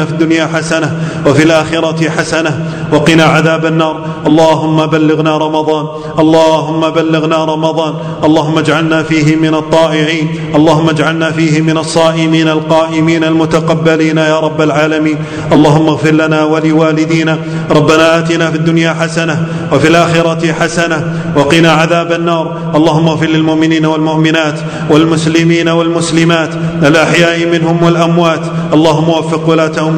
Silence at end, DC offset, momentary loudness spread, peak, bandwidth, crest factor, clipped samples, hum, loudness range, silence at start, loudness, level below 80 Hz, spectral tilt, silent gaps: 0 s; under 0.1%; 6 LU; 0 dBFS; 10 kHz; 10 dB; 2%; none; 1 LU; 0 s; -9 LUFS; -42 dBFS; -6 dB/octave; none